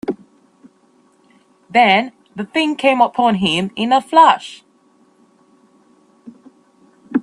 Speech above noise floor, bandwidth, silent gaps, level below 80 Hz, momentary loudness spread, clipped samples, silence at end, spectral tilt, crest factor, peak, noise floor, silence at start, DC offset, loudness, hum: 41 dB; 11.5 kHz; none; -60 dBFS; 18 LU; under 0.1%; 0 s; -5 dB/octave; 18 dB; 0 dBFS; -55 dBFS; 0.1 s; under 0.1%; -15 LUFS; none